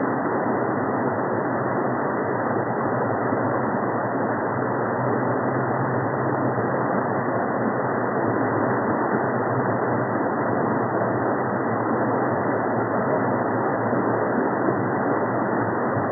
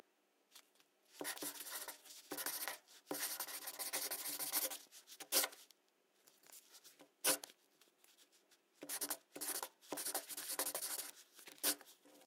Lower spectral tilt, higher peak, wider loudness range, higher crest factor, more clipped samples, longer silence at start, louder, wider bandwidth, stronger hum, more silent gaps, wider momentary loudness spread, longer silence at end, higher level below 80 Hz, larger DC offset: first, -15.5 dB/octave vs 1 dB/octave; first, -8 dBFS vs -20 dBFS; second, 1 LU vs 5 LU; second, 14 dB vs 26 dB; neither; second, 0 s vs 0.55 s; first, -23 LUFS vs -42 LUFS; second, 2.2 kHz vs 17.5 kHz; neither; neither; second, 2 LU vs 21 LU; about the same, 0 s vs 0 s; first, -62 dBFS vs under -90 dBFS; neither